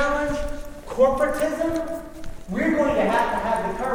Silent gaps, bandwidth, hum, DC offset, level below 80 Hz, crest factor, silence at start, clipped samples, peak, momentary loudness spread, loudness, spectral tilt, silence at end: none; over 20 kHz; none; under 0.1%; -38 dBFS; 16 dB; 0 s; under 0.1%; -6 dBFS; 14 LU; -23 LUFS; -5.5 dB/octave; 0 s